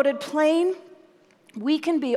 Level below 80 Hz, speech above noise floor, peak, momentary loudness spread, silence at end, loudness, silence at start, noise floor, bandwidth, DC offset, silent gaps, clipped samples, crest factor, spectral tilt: -86 dBFS; 34 dB; -8 dBFS; 14 LU; 0 s; -23 LUFS; 0 s; -56 dBFS; 13 kHz; under 0.1%; none; under 0.1%; 16 dB; -4.5 dB/octave